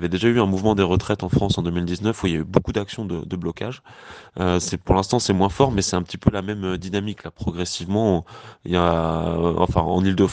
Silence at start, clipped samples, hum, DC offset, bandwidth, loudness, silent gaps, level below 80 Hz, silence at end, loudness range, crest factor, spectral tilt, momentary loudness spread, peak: 0 s; under 0.1%; none; under 0.1%; 9.6 kHz; -22 LUFS; none; -40 dBFS; 0 s; 3 LU; 20 dB; -6 dB/octave; 10 LU; 0 dBFS